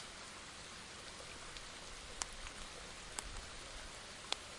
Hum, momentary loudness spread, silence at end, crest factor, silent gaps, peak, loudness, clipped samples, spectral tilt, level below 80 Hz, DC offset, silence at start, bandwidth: none; 5 LU; 0 s; 34 dB; none; -16 dBFS; -48 LUFS; under 0.1%; -1 dB/octave; -58 dBFS; under 0.1%; 0 s; 11.5 kHz